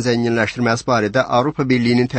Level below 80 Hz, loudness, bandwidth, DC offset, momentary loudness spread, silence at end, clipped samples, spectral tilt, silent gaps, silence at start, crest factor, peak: -50 dBFS; -17 LUFS; 8.8 kHz; under 0.1%; 2 LU; 0 s; under 0.1%; -6 dB/octave; none; 0 s; 14 dB; -2 dBFS